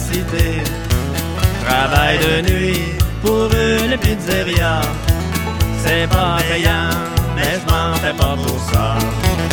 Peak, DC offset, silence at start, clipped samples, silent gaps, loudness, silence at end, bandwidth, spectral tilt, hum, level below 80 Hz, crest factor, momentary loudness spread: 0 dBFS; under 0.1%; 0 s; under 0.1%; none; -16 LUFS; 0 s; 17.5 kHz; -5 dB/octave; none; -24 dBFS; 16 dB; 5 LU